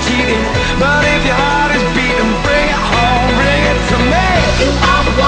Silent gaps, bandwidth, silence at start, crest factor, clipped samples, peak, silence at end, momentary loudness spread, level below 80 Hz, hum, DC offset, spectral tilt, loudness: none; 9.4 kHz; 0 s; 12 dB; under 0.1%; 0 dBFS; 0 s; 2 LU; -20 dBFS; none; under 0.1%; -4.5 dB/octave; -12 LUFS